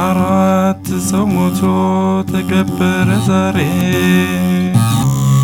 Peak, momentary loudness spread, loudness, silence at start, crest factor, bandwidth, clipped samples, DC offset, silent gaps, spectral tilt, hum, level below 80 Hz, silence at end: 0 dBFS; 3 LU; -14 LUFS; 0 s; 12 dB; 17.5 kHz; under 0.1%; under 0.1%; none; -6.5 dB/octave; none; -44 dBFS; 0 s